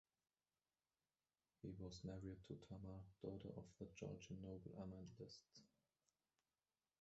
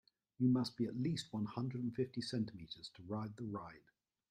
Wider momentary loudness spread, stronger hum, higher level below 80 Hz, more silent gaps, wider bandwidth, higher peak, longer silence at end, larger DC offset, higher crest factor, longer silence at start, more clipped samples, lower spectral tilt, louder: second, 5 LU vs 14 LU; neither; about the same, -74 dBFS vs -76 dBFS; neither; second, 7.6 kHz vs 11.5 kHz; second, -38 dBFS vs -24 dBFS; first, 1.35 s vs 0.5 s; neither; about the same, 20 dB vs 18 dB; first, 1.65 s vs 0.4 s; neither; about the same, -7 dB/octave vs -7 dB/octave; second, -57 LUFS vs -41 LUFS